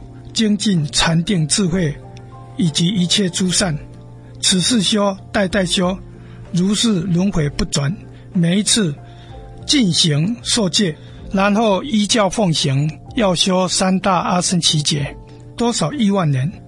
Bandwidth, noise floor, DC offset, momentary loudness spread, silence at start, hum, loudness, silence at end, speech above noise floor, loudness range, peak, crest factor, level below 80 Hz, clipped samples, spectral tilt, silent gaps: 11.5 kHz; -36 dBFS; under 0.1%; 10 LU; 0 s; none; -16 LUFS; 0 s; 20 dB; 2 LU; 0 dBFS; 16 dB; -40 dBFS; under 0.1%; -4 dB/octave; none